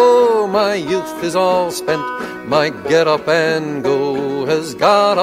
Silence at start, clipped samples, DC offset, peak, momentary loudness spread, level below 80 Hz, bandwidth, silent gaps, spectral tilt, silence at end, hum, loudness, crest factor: 0 s; under 0.1%; under 0.1%; 0 dBFS; 7 LU; -54 dBFS; 15.5 kHz; none; -4.5 dB/octave; 0 s; none; -16 LUFS; 14 dB